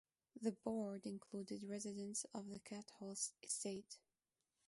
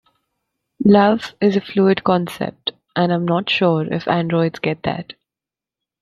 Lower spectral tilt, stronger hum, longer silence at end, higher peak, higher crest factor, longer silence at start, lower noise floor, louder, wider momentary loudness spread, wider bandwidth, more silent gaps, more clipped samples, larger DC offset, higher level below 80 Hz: second, -4 dB/octave vs -7.5 dB/octave; neither; second, 0.7 s vs 0.9 s; second, -28 dBFS vs -2 dBFS; about the same, 20 dB vs 16 dB; second, 0.35 s vs 0.8 s; about the same, under -90 dBFS vs -88 dBFS; second, -48 LUFS vs -18 LUFS; about the same, 9 LU vs 11 LU; second, 11.5 kHz vs 13 kHz; neither; neither; neither; second, -86 dBFS vs -56 dBFS